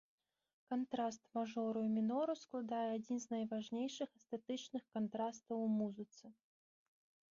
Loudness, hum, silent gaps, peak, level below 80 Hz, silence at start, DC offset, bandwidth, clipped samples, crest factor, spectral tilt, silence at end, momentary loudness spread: -42 LUFS; none; none; -28 dBFS; -88 dBFS; 0.7 s; under 0.1%; 7.4 kHz; under 0.1%; 14 dB; -5.5 dB/octave; 1.05 s; 8 LU